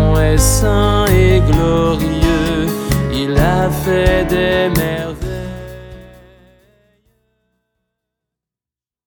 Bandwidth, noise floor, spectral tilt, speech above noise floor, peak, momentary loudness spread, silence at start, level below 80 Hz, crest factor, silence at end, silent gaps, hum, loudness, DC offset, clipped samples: over 20 kHz; under -90 dBFS; -5.5 dB/octave; over 77 dB; 0 dBFS; 13 LU; 0 s; -22 dBFS; 16 dB; 3 s; none; none; -14 LUFS; under 0.1%; under 0.1%